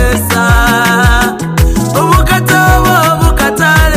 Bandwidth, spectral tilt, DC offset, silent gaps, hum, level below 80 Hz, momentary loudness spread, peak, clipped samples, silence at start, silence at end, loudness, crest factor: 16 kHz; -4.5 dB/octave; under 0.1%; none; none; -14 dBFS; 4 LU; 0 dBFS; 0.6%; 0 s; 0 s; -9 LUFS; 8 dB